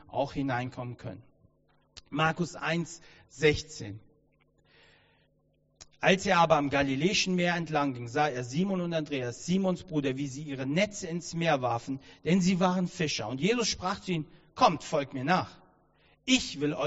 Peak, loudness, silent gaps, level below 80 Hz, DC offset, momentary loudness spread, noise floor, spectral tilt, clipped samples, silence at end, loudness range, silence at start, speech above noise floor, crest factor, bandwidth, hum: -8 dBFS; -29 LUFS; none; -58 dBFS; under 0.1%; 13 LU; -70 dBFS; -4 dB/octave; under 0.1%; 0 s; 6 LU; 0.1 s; 41 dB; 22 dB; 8 kHz; none